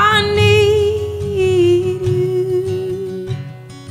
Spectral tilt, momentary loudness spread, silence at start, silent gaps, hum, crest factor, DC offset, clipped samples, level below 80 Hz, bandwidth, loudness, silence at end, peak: -6 dB/octave; 14 LU; 0 s; none; none; 14 dB; under 0.1%; under 0.1%; -40 dBFS; 14.5 kHz; -15 LUFS; 0 s; -2 dBFS